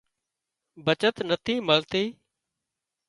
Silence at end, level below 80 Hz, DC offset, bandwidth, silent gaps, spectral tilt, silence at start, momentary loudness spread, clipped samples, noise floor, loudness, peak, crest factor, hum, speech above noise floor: 0.95 s; -64 dBFS; under 0.1%; 11.5 kHz; none; -5 dB/octave; 0.75 s; 7 LU; under 0.1%; -86 dBFS; -25 LUFS; -6 dBFS; 24 dB; none; 60 dB